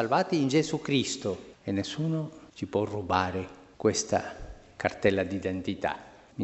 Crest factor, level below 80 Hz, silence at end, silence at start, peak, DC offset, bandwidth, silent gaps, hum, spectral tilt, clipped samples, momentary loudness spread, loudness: 22 dB; -56 dBFS; 0 s; 0 s; -8 dBFS; under 0.1%; 8.2 kHz; none; none; -5 dB/octave; under 0.1%; 14 LU; -29 LUFS